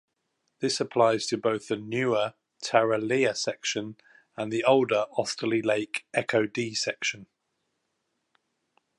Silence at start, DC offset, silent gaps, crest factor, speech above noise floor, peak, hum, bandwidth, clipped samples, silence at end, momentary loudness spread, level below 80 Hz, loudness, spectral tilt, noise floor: 0.6 s; under 0.1%; none; 22 dB; 52 dB; -6 dBFS; none; 11.5 kHz; under 0.1%; 1.75 s; 10 LU; -74 dBFS; -27 LUFS; -4 dB/octave; -78 dBFS